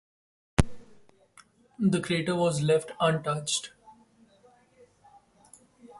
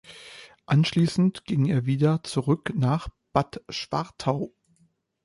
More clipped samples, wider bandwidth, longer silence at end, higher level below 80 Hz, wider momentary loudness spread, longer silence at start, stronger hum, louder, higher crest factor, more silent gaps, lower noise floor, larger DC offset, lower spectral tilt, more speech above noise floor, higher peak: neither; about the same, 11.5 kHz vs 11.5 kHz; second, 0.1 s vs 0.75 s; first, -44 dBFS vs -52 dBFS; second, 5 LU vs 13 LU; first, 0.6 s vs 0.1 s; neither; second, -28 LUFS vs -25 LUFS; first, 28 dB vs 20 dB; neither; second, -61 dBFS vs -66 dBFS; neither; second, -5 dB/octave vs -7 dB/octave; second, 34 dB vs 42 dB; about the same, -4 dBFS vs -6 dBFS